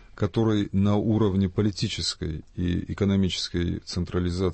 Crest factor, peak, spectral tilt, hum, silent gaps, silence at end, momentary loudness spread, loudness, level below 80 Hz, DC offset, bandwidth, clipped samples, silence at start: 12 dB; -12 dBFS; -6 dB/octave; none; none; 0 s; 6 LU; -26 LUFS; -44 dBFS; under 0.1%; 8.8 kHz; under 0.1%; 0.15 s